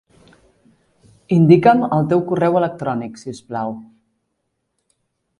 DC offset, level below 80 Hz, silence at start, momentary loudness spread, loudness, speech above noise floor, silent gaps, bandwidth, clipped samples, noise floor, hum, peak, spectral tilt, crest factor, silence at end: under 0.1%; -58 dBFS; 1.3 s; 18 LU; -16 LUFS; 57 dB; none; 10.5 kHz; under 0.1%; -73 dBFS; none; 0 dBFS; -8.5 dB/octave; 18 dB; 1.55 s